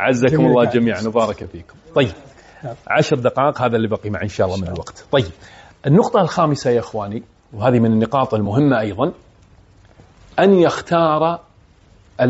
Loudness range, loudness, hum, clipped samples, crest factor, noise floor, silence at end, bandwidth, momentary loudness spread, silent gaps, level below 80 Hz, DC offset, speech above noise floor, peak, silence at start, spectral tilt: 2 LU; -17 LUFS; none; under 0.1%; 16 dB; -50 dBFS; 0 s; 8 kHz; 15 LU; none; -48 dBFS; under 0.1%; 33 dB; -2 dBFS; 0 s; -6 dB/octave